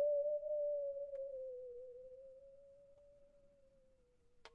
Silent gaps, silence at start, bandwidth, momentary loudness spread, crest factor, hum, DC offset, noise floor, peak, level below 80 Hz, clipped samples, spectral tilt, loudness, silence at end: none; 0 s; 5.6 kHz; 24 LU; 14 dB; none; under 0.1%; -72 dBFS; -30 dBFS; -78 dBFS; under 0.1%; -3.5 dB/octave; -43 LUFS; 0.05 s